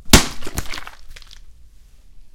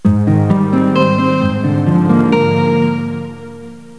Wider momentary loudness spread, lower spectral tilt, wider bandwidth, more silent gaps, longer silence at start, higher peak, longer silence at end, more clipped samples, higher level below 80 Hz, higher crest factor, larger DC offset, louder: first, 29 LU vs 15 LU; second, -3 dB/octave vs -8.5 dB/octave; first, 17 kHz vs 11 kHz; neither; about the same, 0.05 s vs 0.05 s; about the same, 0 dBFS vs 0 dBFS; about the same, 0.05 s vs 0 s; first, 0.2% vs under 0.1%; first, -28 dBFS vs -46 dBFS; first, 20 dB vs 12 dB; second, under 0.1% vs 0.6%; second, -19 LUFS vs -13 LUFS